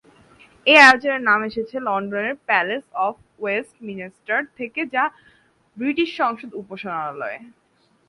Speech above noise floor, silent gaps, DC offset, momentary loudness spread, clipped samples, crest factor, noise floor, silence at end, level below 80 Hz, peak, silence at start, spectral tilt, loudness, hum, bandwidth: 31 dB; none; under 0.1%; 20 LU; under 0.1%; 22 dB; -51 dBFS; 0.6 s; -66 dBFS; 0 dBFS; 0.65 s; -3.5 dB/octave; -19 LUFS; none; 11.5 kHz